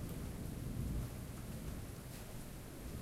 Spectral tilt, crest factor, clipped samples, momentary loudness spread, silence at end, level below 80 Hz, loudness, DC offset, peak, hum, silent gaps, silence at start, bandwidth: -6 dB/octave; 16 dB; under 0.1%; 7 LU; 0 s; -50 dBFS; -47 LUFS; under 0.1%; -30 dBFS; none; none; 0 s; 16 kHz